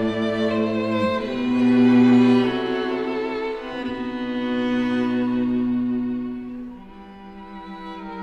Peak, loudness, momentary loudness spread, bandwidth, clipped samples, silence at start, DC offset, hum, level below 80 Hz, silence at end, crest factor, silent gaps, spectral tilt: -6 dBFS; -21 LUFS; 22 LU; 6.8 kHz; under 0.1%; 0 s; under 0.1%; none; -52 dBFS; 0 s; 14 dB; none; -7 dB/octave